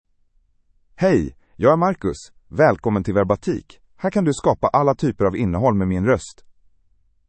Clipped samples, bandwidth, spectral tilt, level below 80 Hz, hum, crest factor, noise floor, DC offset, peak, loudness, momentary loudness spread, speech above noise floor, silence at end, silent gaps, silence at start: under 0.1%; 8.8 kHz; -7.5 dB/octave; -46 dBFS; none; 18 dB; -61 dBFS; under 0.1%; -2 dBFS; -20 LUFS; 10 LU; 42 dB; 0.95 s; none; 1 s